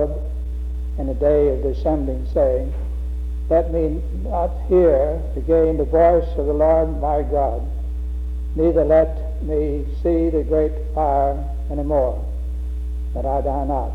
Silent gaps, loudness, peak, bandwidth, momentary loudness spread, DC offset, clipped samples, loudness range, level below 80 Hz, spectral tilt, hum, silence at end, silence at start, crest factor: none; -20 LUFS; -4 dBFS; 3.9 kHz; 12 LU; under 0.1%; under 0.1%; 4 LU; -24 dBFS; -10 dB/octave; none; 0 s; 0 s; 14 dB